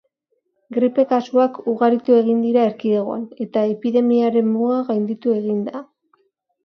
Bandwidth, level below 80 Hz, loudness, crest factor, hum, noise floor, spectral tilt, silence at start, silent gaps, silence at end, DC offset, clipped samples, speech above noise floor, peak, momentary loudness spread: 6.2 kHz; -72 dBFS; -19 LUFS; 16 dB; none; -71 dBFS; -8.5 dB/octave; 0.7 s; none; 0.85 s; under 0.1%; under 0.1%; 53 dB; -4 dBFS; 9 LU